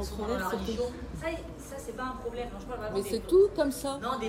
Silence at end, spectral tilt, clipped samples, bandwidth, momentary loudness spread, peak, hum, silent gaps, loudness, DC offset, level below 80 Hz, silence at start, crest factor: 0 s; -5 dB/octave; under 0.1%; 16.5 kHz; 15 LU; -14 dBFS; none; none; -31 LUFS; under 0.1%; -46 dBFS; 0 s; 18 dB